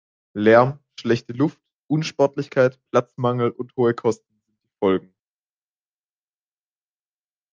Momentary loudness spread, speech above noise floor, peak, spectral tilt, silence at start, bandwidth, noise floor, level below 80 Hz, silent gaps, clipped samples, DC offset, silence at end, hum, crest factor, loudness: 10 LU; over 70 dB; -2 dBFS; -7 dB/octave; 0.35 s; 7.6 kHz; under -90 dBFS; -66 dBFS; 1.73-1.82 s; under 0.1%; under 0.1%; 2.55 s; 50 Hz at -55 dBFS; 20 dB; -21 LUFS